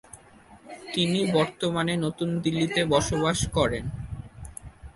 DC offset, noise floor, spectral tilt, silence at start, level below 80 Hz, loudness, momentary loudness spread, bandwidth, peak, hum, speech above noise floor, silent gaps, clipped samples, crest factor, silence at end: under 0.1%; -52 dBFS; -5 dB/octave; 0.15 s; -44 dBFS; -25 LUFS; 19 LU; 11.5 kHz; -8 dBFS; none; 27 dB; none; under 0.1%; 18 dB; 0.05 s